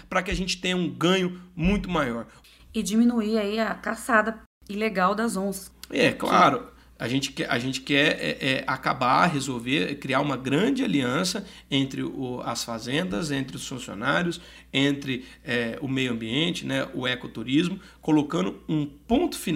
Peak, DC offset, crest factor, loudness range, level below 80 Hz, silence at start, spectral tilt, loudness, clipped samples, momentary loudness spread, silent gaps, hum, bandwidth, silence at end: -4 dBFS; under 0.1%; 20 dB; 4 LU; -48 dBFS; 0 s; -4.5 dB/octave; -25 LUFS; under 0.1%; 10 LU; 4.46-4.61 s; none; 16 kHz; 0 s